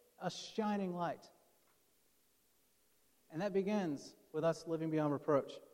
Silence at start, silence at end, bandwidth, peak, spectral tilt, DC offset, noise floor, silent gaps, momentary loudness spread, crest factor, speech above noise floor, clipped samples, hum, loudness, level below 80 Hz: 0.2 s; 0.1 s; 16.5 kHz; -20 dBFS; -6.5 dB/octave; under 0.1%; -75 dBFS; none; 9 LU; 20 dB; 37 dB; under 0.1%; none; -39 LUFS; -82 dBFS